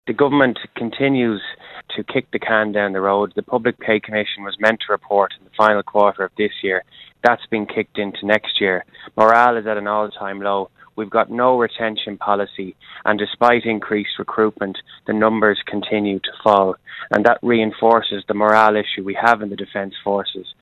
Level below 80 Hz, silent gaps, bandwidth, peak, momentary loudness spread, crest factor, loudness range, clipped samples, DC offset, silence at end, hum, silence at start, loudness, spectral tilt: -58 dBFS; none; 10 kHz; 0 dBFS; 11 LU; 18 dB; 4 LU; under 0.1%; under 0.1%; 0.1 s; none; 0.05 s; -18 LUFS; -6.5 dB/octave